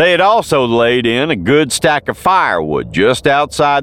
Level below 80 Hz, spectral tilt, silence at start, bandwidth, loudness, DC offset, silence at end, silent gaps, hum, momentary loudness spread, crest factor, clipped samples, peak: -42 dBFS; -4 dB/octave; 0 s; 17 kHz; -12 LUFS; 0.2%; 0 s; none; none; 3 LU; 12 dB; under 0.1%; -2 dBFS